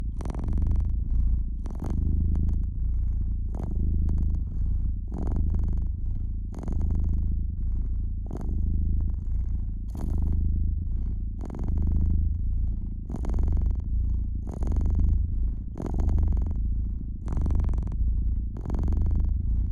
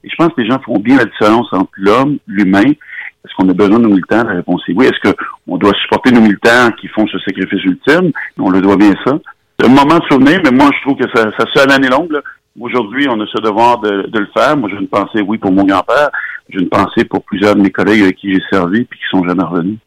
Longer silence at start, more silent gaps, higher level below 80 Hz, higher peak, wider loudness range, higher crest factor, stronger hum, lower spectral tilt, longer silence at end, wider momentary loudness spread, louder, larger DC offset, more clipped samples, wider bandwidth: about the same, 0 s vs 0.05 s; neither; first, -26 dBFS vs -46 dBFS; second, -12 dBFS vs 0 dBFS; about the same, 2 LU vs 3 LU; about the same, 12 dB vs 10 dB; neither; first, -10.5 dB/octave vs -6 dB/octave; about the same, 0 s vs 0.1 s; about the same, 7 LU vs 8 LU; second, -30 LUFS vs -11 LUFS; neither; neither; second, 2.2 kHz vs 13 kHz